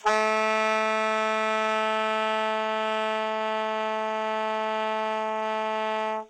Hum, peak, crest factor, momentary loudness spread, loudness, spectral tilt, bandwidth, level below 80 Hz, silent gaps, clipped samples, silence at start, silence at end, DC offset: none; -10 dBFS; 16 dB; 5 LU; -26 LUFS; -3 dB/octave; 11 kHz; -76 dBFS; none; under 0.1%; 0.05 s; 0.05 s; under 0.1%